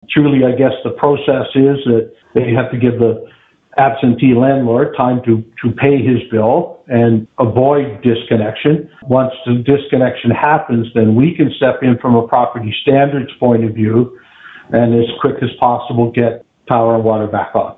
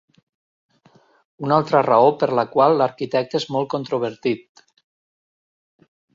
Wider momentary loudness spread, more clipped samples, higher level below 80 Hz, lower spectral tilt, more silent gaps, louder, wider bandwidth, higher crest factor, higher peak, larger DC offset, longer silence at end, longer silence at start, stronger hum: second, 5 LU vs 10 LU; neither; first, -48 dBFS vs -66 dBFS; first, -11 dB/octave vs -6.5 dB/octave; neither; first, -13 LUFS vs -19 LUFS; second, 4 kHz vs 7.8 kHz; second, 12 dB vs 20 dB; about the same, 0 dBFS vs -2 dBFS; neither; second, 0.05 s vs 1.75 s; second, 0.1 s vs 1.4 s; neither